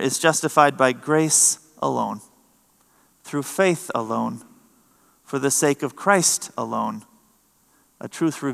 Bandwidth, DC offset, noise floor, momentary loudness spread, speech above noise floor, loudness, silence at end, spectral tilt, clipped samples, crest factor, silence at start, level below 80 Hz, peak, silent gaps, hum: 15 kHz; under 0.1%; -61 dBFS; 14 LU; 40 dB; -21 LUFS; 0 s; -3 dB/octave; under 0.1%; 22 dB; 0 s; -76 dBFS; 0 dBFS; none; none